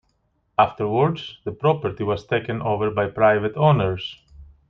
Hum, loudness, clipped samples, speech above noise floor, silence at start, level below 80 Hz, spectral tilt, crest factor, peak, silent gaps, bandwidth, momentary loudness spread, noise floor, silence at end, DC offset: none; -21 LUFS; under 0.1%; 47 dB; 0.6 s; -50 dBFS; -8.5 dB/octave; 20 dB; -2 dBFS; none; 6.4 kHz; 9 LU; -68 dBFS; 0.25 s; under 0.1%